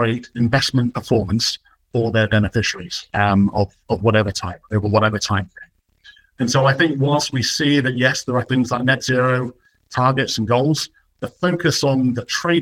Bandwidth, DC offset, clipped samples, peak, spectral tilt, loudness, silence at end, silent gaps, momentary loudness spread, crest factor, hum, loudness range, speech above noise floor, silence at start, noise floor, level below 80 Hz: 16 kHz; under 0.1%; under 0.1%; -2 dBFS; -5 dB/octave; -19 LUFS; 0 s; none; 8 LU; 16 dB; none; 2 LU; 31 dB; 0 s; -50 dBFS; -48 dBFS